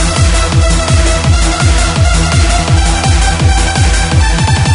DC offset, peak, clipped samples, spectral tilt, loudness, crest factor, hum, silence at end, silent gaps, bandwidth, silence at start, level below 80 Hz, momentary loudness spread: under 0.1%; 0 dBFS; under 0.1%; -4 dB/octave; -10 LUFS; 8 dB; none; 0 s; none; 11 kHz; 0 s; -12 dBFS; 1 LU